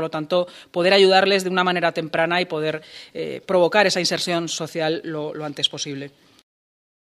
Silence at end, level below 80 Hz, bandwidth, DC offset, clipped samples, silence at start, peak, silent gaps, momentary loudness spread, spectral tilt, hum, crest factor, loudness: 0.95 s; -70 dBFS; 14 kHz; under 0.1%; under 0.1%; 0 s; 0 dBFS; none; 15 LU; -3.5 dB/octave; none; 22 dB; -20 LUFS